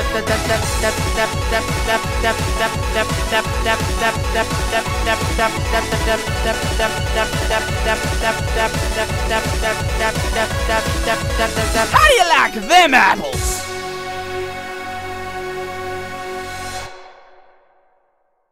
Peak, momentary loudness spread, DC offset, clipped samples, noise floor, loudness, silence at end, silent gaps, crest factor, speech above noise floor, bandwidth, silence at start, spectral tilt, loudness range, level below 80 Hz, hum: -2 dBFS; 14 LU; under 0.1%; under 0.1%; -63 dBFS; -18 LUFS; 1.2 s; none; 16 dB; 46 dB; 16 kHz; 0 s; -3.5 dB/octave; 12 LU; -26 dBFS; none